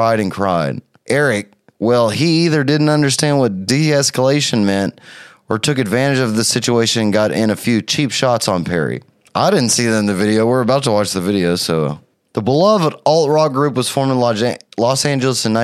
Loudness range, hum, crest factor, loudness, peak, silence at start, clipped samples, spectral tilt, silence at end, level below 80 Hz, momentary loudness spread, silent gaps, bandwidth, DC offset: 1 LU; none; 14 dB; -15 LUFS; 0 dBFS; 0 s; under 0.1%; -4.5 dB/octave; 0 s; -56 dBFS; 6 LU; none; 15 kHz; under 0.1%